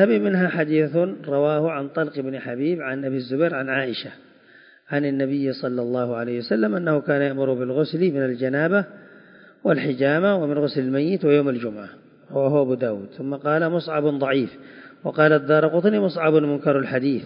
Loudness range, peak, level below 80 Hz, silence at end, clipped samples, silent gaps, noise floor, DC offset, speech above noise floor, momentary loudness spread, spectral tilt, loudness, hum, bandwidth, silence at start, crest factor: 5 LU; -2 dBFS; -72 dBFS; 0 s; under 0.1%; none; -51 dBFS; under 0.1%; 30 dB; 9 LU; -11.5 dB/octave; -22 LUFS; none; 5.4 kHz; 0 s; 18 dB